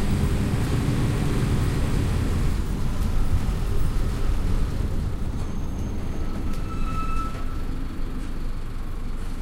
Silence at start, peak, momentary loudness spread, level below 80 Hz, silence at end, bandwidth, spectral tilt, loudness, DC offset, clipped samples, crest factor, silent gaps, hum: 0 s; -10 dBFS; 10 LU; -26 dBFS; 0 s; 16 kHz; -6.5 dB/octave; -28 LUFS; under 0.1%; under 0.1%; 12 dB; none; none